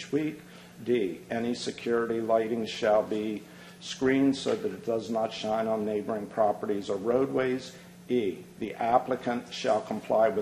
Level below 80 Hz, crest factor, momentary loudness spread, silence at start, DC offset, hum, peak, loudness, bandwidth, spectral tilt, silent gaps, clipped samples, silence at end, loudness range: -66 dBFS; 20 dB; 13 LU; 0 s; under 0.1%; none; -10 dBFS; -29 LUFS; 13 kHz; -5.5 dB/octave; none; under 0.1%; 0 s; 1 LU